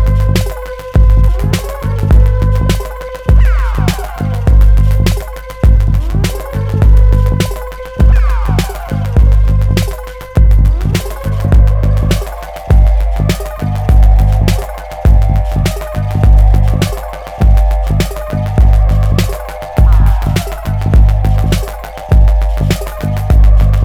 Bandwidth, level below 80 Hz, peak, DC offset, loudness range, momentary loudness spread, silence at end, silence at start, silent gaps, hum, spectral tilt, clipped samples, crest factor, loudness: 15 kHz; -10 dBFS; 0 dBFS; under 0.1%; 1 LU; 9 LU; 0 s; 0 s; none; none; -6.5 dB/octave; 0.2%; 10 dB; -12 LUFS